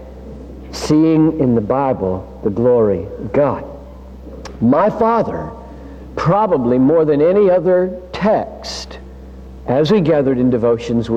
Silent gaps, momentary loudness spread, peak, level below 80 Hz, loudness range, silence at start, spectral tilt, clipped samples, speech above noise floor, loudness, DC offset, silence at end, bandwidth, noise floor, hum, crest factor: none; 22 LU; -4 dBFS; -38 dBFS; 3 LU; 0 s; -7.5 dB/octave; under 0.1%; 20 dB; -15 LUFS; under 0.1%; 0 s; 9.6 kHz; -34 dBFS; none; 12 dB